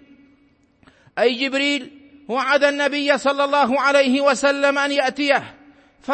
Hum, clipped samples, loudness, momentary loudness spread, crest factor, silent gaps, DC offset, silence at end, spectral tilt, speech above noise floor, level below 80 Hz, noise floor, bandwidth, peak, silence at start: none; under 0.1%; -18 LUFS; 7 LU; 18 dB; none; under 0.1%; 0 s; -2.5 dB/octave; 39 dB; -66 dBFS; -58 dBFS; 8.8 kHz; -2 dBFS; 1.15 s